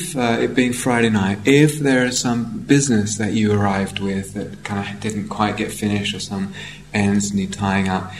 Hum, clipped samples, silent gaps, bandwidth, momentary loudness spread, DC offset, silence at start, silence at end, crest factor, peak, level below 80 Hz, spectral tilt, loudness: none; under 0.1%; none; 15.5 kHz; 10 LU; 0.3%; 0 s; 0 s; 18 dB; 0 dBFS; -48 dBFS; -5 dB/octave; -19 LUFS